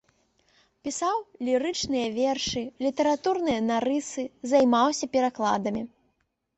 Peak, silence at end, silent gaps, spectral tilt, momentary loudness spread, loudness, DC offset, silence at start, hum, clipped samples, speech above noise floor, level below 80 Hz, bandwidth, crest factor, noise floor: -10 dBFS; 0.7 s; none; -3.5 dB/octave; 11 LU; -26 LUFS; under 0.1%; 0.85 s; none; under 0.1%; 49 dB; -60 dBFS; 8.4 kHz; 18 dB; -74 dBFS